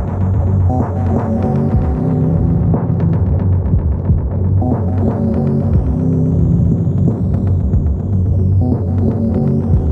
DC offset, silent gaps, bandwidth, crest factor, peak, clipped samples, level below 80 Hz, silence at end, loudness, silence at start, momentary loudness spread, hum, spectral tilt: under 0.1%; none; 2.5 kHz; 12 dB; -2 dBFS; under 0.1%; -24 dBFS; 0 s; -15 LUFS; 0 s; 2 LU; none; -12 dB/octave